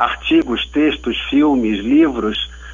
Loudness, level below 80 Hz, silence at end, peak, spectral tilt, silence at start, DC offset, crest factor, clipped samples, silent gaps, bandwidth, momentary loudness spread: -16 LUFS; -36 dBFS; 0 s; -2 dBFS; -5.5 dB/octave; 0 s; under 0.1%; 14 dB; under 0.1%; none; 7.4 kHz; 7 LU